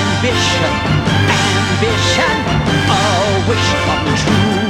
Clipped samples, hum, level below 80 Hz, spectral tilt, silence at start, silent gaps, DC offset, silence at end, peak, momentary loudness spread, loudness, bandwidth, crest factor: under 0.1%; none; -30 dBFS; -4.5 dB/octave; 0 s; none; under 0.1%; 0 s; -2 dBFS; 2 LU; -13 LUFS; 13.5 kHz; 12 dB